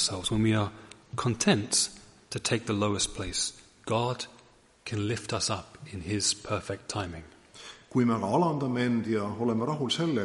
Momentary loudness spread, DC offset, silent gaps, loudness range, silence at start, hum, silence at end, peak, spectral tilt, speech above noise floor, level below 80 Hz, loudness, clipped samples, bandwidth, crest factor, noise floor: 14 LU; under 0.1%; none; 4 LU; 0 s; none; 0 s; -10 dBFS; -4 dB/octave; 30 dB; -54 dBFS; -29 LUFS; under 0.1%; 11.5 kHz; 20 dB; -59 dBFS